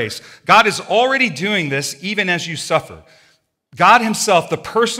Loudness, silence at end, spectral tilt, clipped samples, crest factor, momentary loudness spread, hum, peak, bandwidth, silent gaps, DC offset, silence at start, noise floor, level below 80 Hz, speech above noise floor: -15 LUFS; 0 s; -3 dB/octave; under 0.1%; 16 dB; 9 LU; none; 0 dBFS; 16.5 kHz; none; under 0.1%; 0 s; -53 dBFS; -60 dBFS; 37 dB